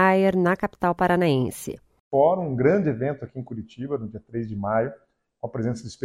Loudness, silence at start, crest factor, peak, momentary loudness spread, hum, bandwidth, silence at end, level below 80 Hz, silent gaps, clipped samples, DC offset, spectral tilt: -24 LUFS; 0 s; 18 dB; -6 dBFS; 15 LU; none; 16 kHz; 0.1 s; -54 dBFS; 2.00-2.11 s; under 0.1%; under 0.1%; -7 dB/octave